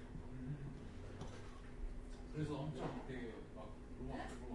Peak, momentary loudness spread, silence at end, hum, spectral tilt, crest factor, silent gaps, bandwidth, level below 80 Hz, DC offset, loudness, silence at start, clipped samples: -32 dBFS; 10 LU; 0 s; none; -7 dB/octave; 16 dB; none; 11.5 kHz; -54 dBFS; under 0.1%; -50 LUFS; 0 s; under 0.1%